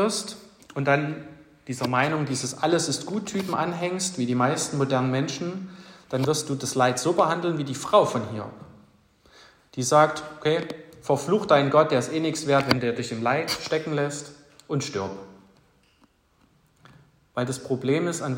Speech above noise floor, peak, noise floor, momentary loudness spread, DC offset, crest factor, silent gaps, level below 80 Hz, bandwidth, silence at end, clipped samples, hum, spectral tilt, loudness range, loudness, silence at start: 39 dB; -2 dBFS; -63 dBFS; 15 LU; under 0.1%; 22 dB; none; -64 dBFS; 16 kHz; 0 s; under 0.1%; none; -4.5 dB/octave; 9 LU; -25 LUFS; 0 s